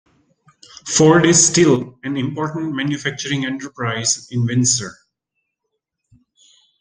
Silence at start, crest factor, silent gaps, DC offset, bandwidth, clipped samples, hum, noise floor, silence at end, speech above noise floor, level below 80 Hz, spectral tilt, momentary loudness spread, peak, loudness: 0.85 s; 18 dB; none; under 0.1%; 10.5 kHz; under 0.1%; none; -77 dBFS; 1.9 s; 60 dB; -56 dBFS; -4 dB/octave; 13 LU; 0 dBFS; -17 LUFS